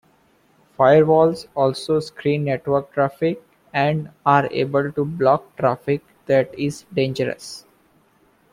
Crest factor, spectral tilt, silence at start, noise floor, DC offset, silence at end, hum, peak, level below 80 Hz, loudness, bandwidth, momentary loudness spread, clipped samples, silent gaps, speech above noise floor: 18 dB; -7 dB/octave; 0.8 s; -59 dBFS; under 0.1%; 0.95 s; none; -2 dBFS; -58 dBFS; -20 LUFS; 14.5 kHz; 10 LU; under 0.1%; none; 39 dB